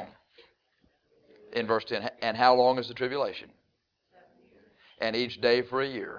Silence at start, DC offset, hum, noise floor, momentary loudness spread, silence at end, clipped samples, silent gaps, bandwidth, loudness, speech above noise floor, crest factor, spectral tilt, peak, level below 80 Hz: 0 s; under 0.1%; none; -76 dBFS; 12 LU; 0 s; under 0.1%; none; 5.4 kHz; -27 LUFS; 49 dB; 22 dB; -5.5 dB/octave; -8 dBFS; -70 dBFS